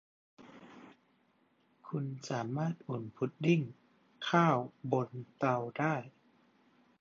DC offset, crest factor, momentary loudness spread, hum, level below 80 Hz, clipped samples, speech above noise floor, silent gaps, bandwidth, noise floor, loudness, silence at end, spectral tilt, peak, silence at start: under 0.1%; 22 dB; 19 LU; none; -80 dBFS; under 0.1%; 39 dB; none; 7.4 kHz; -72 dBFS; -34 LUFS; 0.9 s; -6 dB/octave; -14 dBFS; 0.4 s